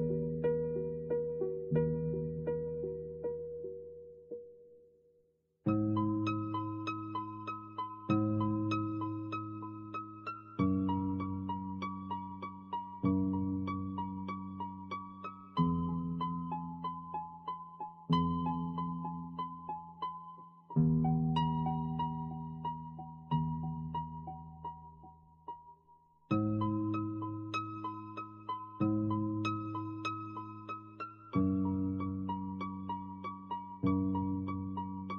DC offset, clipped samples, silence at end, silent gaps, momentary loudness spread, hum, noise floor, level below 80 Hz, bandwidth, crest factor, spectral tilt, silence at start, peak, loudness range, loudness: under 0.1%; under 0.1%; 0 s; none; 13 LU; none; -73 dBFS; -60 dBFS; 6.8 kHz; 18 dB; -7.5 dB/octave; 0 s; -18 dBFS; 5 LU; -37 LUFS